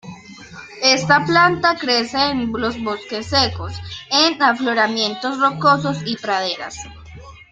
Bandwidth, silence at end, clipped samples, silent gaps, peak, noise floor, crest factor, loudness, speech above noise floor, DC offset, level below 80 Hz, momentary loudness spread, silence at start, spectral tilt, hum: 12 kHz; 0.1 s; under 0.1%; none; 0 dBFS; -39 dBFS; 18 dB; -17 LUFS; 21 dB; under 0.1%; -50 dBFS; 18 LU; 0.05 s; -3.5 dB/octave; none